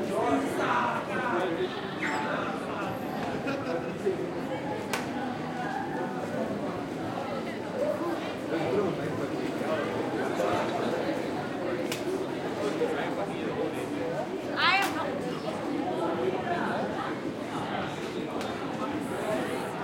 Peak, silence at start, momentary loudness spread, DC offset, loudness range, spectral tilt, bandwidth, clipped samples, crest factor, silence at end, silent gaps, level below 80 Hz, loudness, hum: -10 dBFS; 0 s; 6 LU; under 0.1%; 3 LU; -5 dB/octave; 16.5 kHz; under 0.1%; 22 dB; 0 s; none; -64 dBFS; -31 LUFS; none